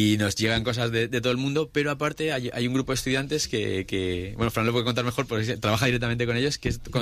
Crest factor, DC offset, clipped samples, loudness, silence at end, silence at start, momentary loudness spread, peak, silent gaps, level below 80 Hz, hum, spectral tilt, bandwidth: 16 dB; under 0.1%; under 0.1%; -26 LUFS; 0 s; 0 s; 4 LU; -10 dBFS; none; -46 dBFS; none; -5 dB/octave; 15.5 kHz